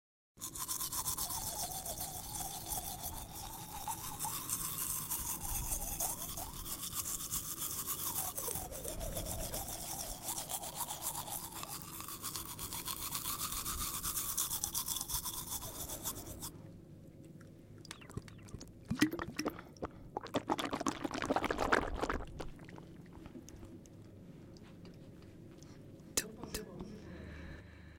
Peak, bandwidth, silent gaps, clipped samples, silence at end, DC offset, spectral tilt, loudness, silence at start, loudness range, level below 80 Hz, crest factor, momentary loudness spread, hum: -14 dBFS; 17 kHz; none; under 0.1%; 0 s; under 0.1%; -2.5 dB/octave; -39 LUFS; 0.35 s; 9 LU; -54 dBFS; 28 dB; 19 LU; none